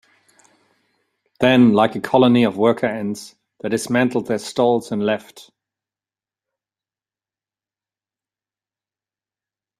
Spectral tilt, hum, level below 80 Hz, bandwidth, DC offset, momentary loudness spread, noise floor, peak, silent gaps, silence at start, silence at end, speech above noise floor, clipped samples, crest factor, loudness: -6 dB/octave; none; -60 dBFS; 13 kHz; under 0.1%; 13 LU; under -90 dBFS; 0 dBFS; none; 1.4 s; 4.4 s; over 73 dB; under 0.1%; 20 dB; -18 LUFS